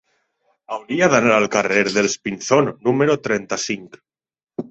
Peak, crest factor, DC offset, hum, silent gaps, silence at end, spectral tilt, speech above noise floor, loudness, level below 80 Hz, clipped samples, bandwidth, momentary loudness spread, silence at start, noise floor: -2 dBFS; 18 dB; under 0.1%; none; none; 0.1 s; -4 dB/octave; 48 dB; -18 LUFS; -58 dBFS; under 0.1%; 8.2 kHz; 15 LU; 0.7 s; -67 dBFS